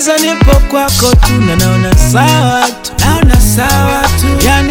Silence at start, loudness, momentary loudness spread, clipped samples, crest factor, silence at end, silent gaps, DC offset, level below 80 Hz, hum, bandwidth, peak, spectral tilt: 0 s; -9 LUFS; 3 LU; 1%; 8 dB; 0 s; none; under 0.1%; -12 dBFS; none; 18.5 kHz; 0 dBFS; -4.5 dB/octave